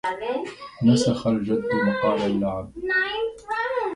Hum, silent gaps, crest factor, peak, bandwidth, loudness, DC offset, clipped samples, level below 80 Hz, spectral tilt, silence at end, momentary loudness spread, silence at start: none; none; 18 dB; -6 dBFS; 11.5 kHz; -24 LUFS; under 0.1%; under 0.1%; -52 dBFS; -6 dB/octave; 0 s; 9 LU; 0.05 s